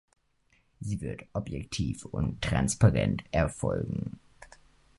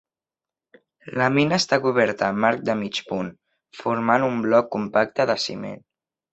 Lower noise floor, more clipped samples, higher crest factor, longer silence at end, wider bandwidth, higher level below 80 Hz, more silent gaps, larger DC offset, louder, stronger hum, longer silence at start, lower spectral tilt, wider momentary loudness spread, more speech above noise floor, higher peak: second, -69 dBFS vs under -90 dBFS; neither; about the same, 24 dB vs 20 dB; about the same, 0.55 s vs 0.55 s; first, 11.5 kHz vs 8.2 kHz; first, -44 dBFS vs -62 dBFS; neither; neither; second, -30 LUFS vs -22 LUFS; neither; second, 0.8 s vs 1.05 s; about the same, -6 dB/octave vs -5 dB/octave; about the same, 13 LU vs 12 LU; second, 40 dB vs over 68 dB; about the same, -6 dBFS vs -4 dBFS